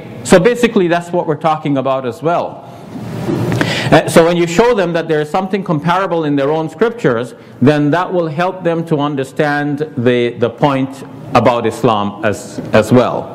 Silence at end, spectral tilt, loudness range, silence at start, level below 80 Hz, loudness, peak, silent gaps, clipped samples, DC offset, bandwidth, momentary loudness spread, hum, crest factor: 0 s; -6 dB/octave; 3 LU; 0 s; -44 dBFS; -14 LUFS; 0 dBFS; none; 0.2%; under 0.1%; 15.5 kHz; 8 LU; none; 14 dB